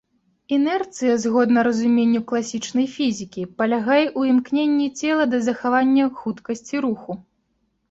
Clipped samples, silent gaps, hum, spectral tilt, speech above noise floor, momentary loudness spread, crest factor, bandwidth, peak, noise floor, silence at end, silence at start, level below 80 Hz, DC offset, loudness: under 0.1%; none; none; -4.5 dB/octave; 50 dB; 10 LU; 14 dB; 8 kHz; -6 dBFS; -69 dBFS; 0.7 s; 0.5 s; -64 dBFS; under 0.1%; -20 LUFS